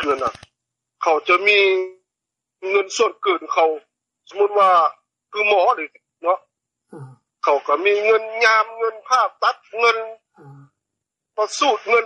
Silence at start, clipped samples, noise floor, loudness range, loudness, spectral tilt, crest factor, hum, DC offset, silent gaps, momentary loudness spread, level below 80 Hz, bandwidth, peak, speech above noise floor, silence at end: 0 s; under 0.1%; -84 dBFS; 2 LU; -18 LUFS; -2 dB/octave; 16 dB; none; under 0.1%; none; 12 LU; -68 dBFS; 9.6 kHz; -4 dBFS; 66 dB; 0 s